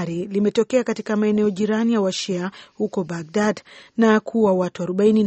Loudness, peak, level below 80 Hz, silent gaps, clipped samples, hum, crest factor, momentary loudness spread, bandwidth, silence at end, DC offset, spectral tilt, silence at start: -21 LUFS; -4 dBFS; -62 dBFS; none; under 0.1%; none; 16 dB; 9 LU; 8.4 kHz; 0 s; under 0.1%; -6 dB/octave; 0 s